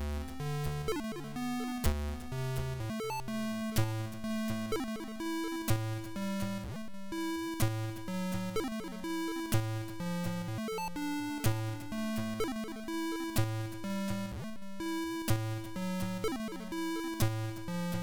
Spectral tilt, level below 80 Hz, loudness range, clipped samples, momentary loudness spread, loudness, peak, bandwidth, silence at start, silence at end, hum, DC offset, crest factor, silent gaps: -5.5 dB/octave; -48 dBFS; 1 LU; under 0.1%; 5 LU; -36 LUFS; -20 dBFS; 17.5 kHz; 0 s; 0 s; none; 0.2%; 16 dB; none